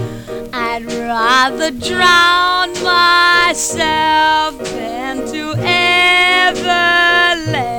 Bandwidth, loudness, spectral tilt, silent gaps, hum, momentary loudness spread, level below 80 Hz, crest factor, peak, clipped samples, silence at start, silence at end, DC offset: 19 kHz; -12 LUFS; -2.5 dB/octave; none; none; 13 LU; -42 dBFS; 14 dB; 0 dBFS; under 0.1%; 0 s; 0 s; 0.2%